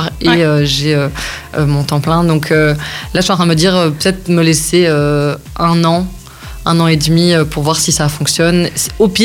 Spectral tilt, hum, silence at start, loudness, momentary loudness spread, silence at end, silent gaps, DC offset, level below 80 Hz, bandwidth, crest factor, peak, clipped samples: -4.5 dB/octave; none; 0 s; -12 LUFS; 7 LU; 0 s; none; 0.1%; -32 dBFS; 17 kHz; 12 dB; 0 dBFS; under 0.1%